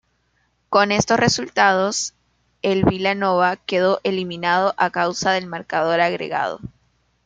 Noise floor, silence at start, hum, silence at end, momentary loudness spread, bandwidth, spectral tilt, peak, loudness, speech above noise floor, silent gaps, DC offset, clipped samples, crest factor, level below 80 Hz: -66 dBFS; 0.7 s; 60 Hz at -50 dBFS; 0.55 s; 8 LU; 9.6 kHz; -4 dB/octave; -2 dBFS; -19 LUFS; 47 dB; none; under 0.1%; under 0.1%; 18 dB; -52 dBFS